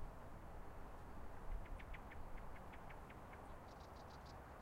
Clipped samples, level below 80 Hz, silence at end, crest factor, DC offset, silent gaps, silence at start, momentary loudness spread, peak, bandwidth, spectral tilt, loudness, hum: under 0.1%; -56 dBFS; 0 s; 16 dB; under 0.1%; none; 0 s; 3 LU; -36 dBFS; 16 kHz; -6 dB/octave; -57 LUFS; none